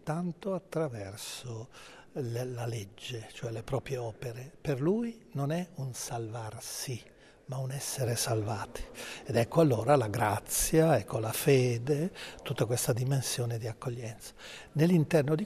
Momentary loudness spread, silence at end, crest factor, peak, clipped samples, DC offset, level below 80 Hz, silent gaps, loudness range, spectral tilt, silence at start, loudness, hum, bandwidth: 16 LU; 0 s; 20 dB; -12 dBFS; under 0.1%; under 0.1%; -56 dBFS; none; 10 LU; -5.5 dB/octave; 0.05 s; -32 LUFS; none; 14 kHz